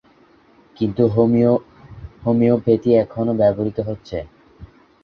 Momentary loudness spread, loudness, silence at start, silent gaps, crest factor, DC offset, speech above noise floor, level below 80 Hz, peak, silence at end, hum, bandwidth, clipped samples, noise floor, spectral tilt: 14 LU; -18 LUFS; 0.8 s; none; 16 dB; under 0.1%; 35 dB; -46 dBFS; -2 dBFS; 0.4 s; none; 5.8 kHz; under 0.1%; -52 dBFS; -10.5 dB/octave